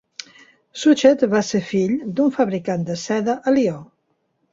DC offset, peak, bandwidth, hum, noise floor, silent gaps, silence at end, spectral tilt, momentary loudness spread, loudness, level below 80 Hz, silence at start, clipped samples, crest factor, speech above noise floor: under 0.1%; -2 dBFS; 7.8 kHz; none; -69 dBFS; none; 0.7 s; -5.5 dB/octave; 15 LU; -19 LUFS; -62 dBFS; 0.75 s; under 0.1%; 18 dB; 50 dB